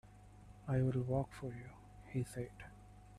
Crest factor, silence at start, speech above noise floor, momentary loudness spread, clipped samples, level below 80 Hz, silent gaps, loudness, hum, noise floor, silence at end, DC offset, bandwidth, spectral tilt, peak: 18 dB; 0.05 s; 20 dB; 24 LU; under 0.1%; -60 dBFS; none; -40 LUFS; 50 Hz at -55 dBFS; -59 dBFS; 0 s; under 0.1%; 12.5 kHz; -8 dB/octave; -24 dBFS